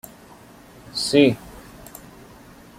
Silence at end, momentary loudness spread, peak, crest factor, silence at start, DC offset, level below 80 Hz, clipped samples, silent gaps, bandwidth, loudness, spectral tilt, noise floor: 1.2 s; 26 LU; -4 dBFS; 22 dB; 0.95 s; under 0.1%; -54 dBFS; under 0.1%; none; 16 kHz; -20 LUFS; -4.5 dB/octave; -46 dBFS